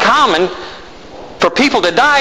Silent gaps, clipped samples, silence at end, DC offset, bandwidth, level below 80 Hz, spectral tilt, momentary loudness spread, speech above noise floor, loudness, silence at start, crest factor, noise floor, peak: none; under 0.1%; 0 s; 1%; 14 kHz; -44 dBFS; -3 dB/octave; 23 LU; 21 dB; -12 LUFS; 0 s; 12 dB; -33 dBFS; 0 dBFS